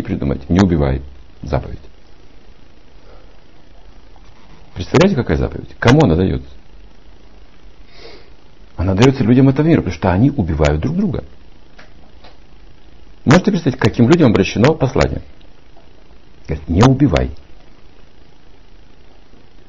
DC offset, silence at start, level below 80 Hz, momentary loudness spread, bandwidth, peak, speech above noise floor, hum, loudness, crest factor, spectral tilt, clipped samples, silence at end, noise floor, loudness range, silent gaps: 2%; 0 s; -32 dBFS; 15 LU; 7.6 kHz; 0 dBFS; 31 dB; none; -15 LUFS; 18 dB; -7 dB/octave; under 0.1%; 2.05 s; -44 dBFS; 6 LU; none